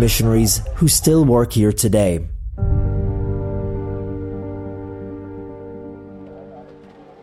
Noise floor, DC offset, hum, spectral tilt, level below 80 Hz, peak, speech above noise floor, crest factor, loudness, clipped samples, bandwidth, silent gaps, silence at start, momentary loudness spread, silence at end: -42 dBFS; under 0.1%; none; -5.5 dB/octave; -28 dBFS; -2 dBFS; 27 dB; 18 dB; -18 LUFS; under 0.1%; 16 kHz; none; 0 s; 21 LU; 0.2 s